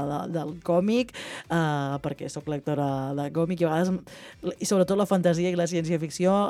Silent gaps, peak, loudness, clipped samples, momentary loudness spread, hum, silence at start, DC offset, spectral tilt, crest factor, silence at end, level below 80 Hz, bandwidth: none; -10 dBFS; -27 LUFS; under 0.1%; 10 LU; none; 0 s; under 0.1%; -6 dB/octave; 16 dB; 0 s; -60 dBFS; 14.5 kHz